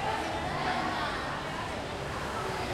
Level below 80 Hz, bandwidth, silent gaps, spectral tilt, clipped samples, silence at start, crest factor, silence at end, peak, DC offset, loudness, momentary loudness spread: -48 dBFS; 16.5 kHz; none; -4.5 dB/octave; under 0.1%; 0 s; 16 dB; 0 s; -18 dBFS; under 0.1%; -33 LUFS; 5 LU